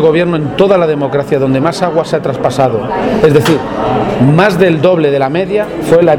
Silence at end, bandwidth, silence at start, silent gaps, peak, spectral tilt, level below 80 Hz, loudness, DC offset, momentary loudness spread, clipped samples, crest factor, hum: 0 s; 19.5 kHz; 0 s; none; 0 dBFS; -7 dB/octave; -38 dBFS; -11 LUFS; under 0.1%; 6 LU; 0.3%; 10 dB; none